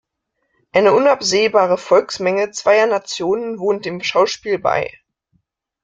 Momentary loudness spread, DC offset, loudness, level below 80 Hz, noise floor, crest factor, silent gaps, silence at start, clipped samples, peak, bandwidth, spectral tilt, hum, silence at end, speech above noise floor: 7 LU; under 0.1%; -16 LUFS; -60 dBFS; -72 dBFS; 16 dB; none; 0.75 s; under 0.1%; -2 dBFS; 9.2 kHz; -3.5 dB/octave; none; 0.95 s; 56 dB